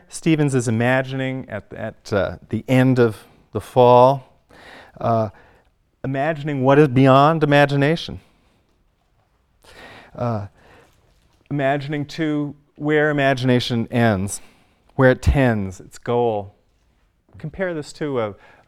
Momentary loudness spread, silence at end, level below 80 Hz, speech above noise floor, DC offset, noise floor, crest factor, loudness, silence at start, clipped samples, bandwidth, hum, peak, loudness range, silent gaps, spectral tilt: 18 LU; 0.35 s; -40 dBFS; 44 dB; under 0.1%; -63 dBFS; 20 dB; -19 LUFS; 0.15 s; under 0.1%; 13.5 kHz; none; 0 dBFS; 9 LU; none; -6.5 dB/octave